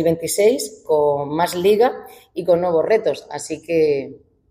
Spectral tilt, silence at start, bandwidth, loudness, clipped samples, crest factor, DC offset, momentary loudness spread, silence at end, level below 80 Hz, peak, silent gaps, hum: -4.5 dB/octave; 0 s; 16 kHz; -19 LUFS; under 0.1%; 14 dB; under 0.1%; 12 LU; 0.35 s; -60 dBFS; -6 dBFS; none; none